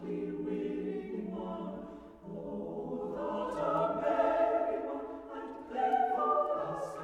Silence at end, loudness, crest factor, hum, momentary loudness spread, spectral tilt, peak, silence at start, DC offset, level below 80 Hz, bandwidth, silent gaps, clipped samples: 0 s; -34 LUFS; 16 dB; none; 14 LU; -7.5 dB/octave; -18 dBFS; 0 s; under 0.1%; -64 dBFS; 11 kHz; none; under 0.1%